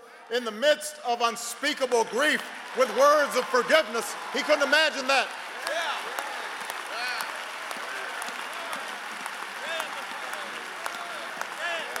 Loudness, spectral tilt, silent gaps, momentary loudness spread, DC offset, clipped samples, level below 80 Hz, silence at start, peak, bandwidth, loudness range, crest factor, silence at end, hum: -27 LUFS; -1 dB/octave; none; 12 LU; under 0.1%; under 0.1%; -80 dBFS; 0 s; -6 dBFS; 16.5 kHz; 10 LU; 22 dB; 0 s; none